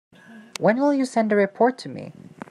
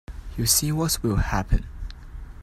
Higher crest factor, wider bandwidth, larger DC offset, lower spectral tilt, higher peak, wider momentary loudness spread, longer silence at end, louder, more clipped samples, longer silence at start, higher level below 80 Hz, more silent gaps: about the same, 18 dB vs 20 dB; second, 13 kHz vs 16 kHz; neither; first, -6 dB/octave vs -3.5 dB/octave; about the same, -4 dBFS vs -4 dBFS; about the same, 19 LU vs 20 LU; first, 0.4 s vs 0 s; about the same, -21 LUFS vs -23 LUFS; neither; first, 0.3 s vs 0.1 s; second, -76 dBFS vs -30 dBFS; neither